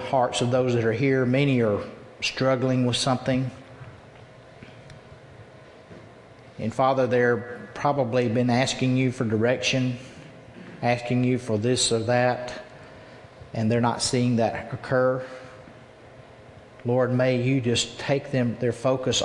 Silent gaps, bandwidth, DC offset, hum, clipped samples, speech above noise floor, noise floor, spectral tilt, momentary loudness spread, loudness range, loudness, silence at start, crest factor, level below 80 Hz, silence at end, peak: none; 11 kHz; under 0.1%; none; under 0.1%; 25 dB; -48 dBFS; -5 dB/octave; 18 LU; 5 LU; -24 LUFS; 0 s; 18 dB; -58 dBFS; 0 s; -8 dBFS